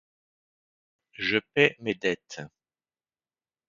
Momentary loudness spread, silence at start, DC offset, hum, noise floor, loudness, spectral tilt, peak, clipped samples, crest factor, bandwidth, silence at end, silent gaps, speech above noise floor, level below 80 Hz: 19 LU; 1.2 s; under 0.1%; none; under -90 dBFS; -26 LUFS; -4.5 dB/octave; -4 dBFS; under 0.1%; 28 dB; 7.4 kHz; 1.2 s; none; over 63 dB; -70 dBFS